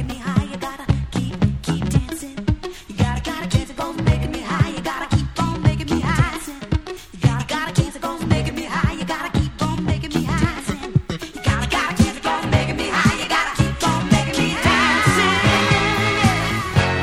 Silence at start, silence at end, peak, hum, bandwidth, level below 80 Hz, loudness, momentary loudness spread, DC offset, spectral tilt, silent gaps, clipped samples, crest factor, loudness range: 0 s; 0 s; 0 dBFS; none; 16 kHz; -32 dBFS; -20 LUFS; 10 LU; under 0.1%; -5 dB/octave; none; under 0.1%; 20 dB; 6 LU